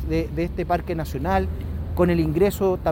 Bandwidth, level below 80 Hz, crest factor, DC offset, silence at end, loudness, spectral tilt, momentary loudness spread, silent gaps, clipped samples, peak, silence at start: 17 kHz; -32 dBFS; 16 dB; under 0.1%; 0 s; -23 LUFS; -7.5 dB/octave; 8 LU; none; under 0.1%; -6 dBFS; 0 s